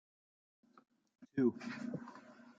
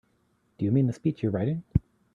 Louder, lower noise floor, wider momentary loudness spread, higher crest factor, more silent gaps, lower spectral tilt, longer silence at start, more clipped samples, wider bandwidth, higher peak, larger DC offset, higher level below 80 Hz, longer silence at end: second, -40 LUFS vs -28 LUFS; second, -57 dBFS vs -69 dBFS; first, 18 LU vs 5 LU; about the same, 22 dB vs 20 dB; neither; second, -7.5 dB/octave vs -10 dB/octave; first, 1.2 s vs 0.6 s; neither; about the same, 7.6 kHz vs 7.4 kHz; second, -22 dBFS vs -8 dBFS; neither; second, -86 dBFS vs -46 dBFS; second, 0.05 s vs 0.35 s